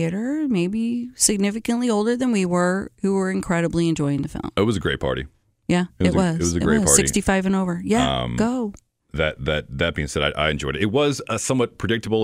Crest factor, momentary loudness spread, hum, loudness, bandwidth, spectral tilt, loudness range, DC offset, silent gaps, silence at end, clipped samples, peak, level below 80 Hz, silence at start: 20 dB; 6 LU; none; -21 LUFS; 16 kHz; -4.5 dB/octave; 3 LU; under 0.1%; none; 0 s; under 0.1%; -2 dBFS; -40 dBFS; 0 s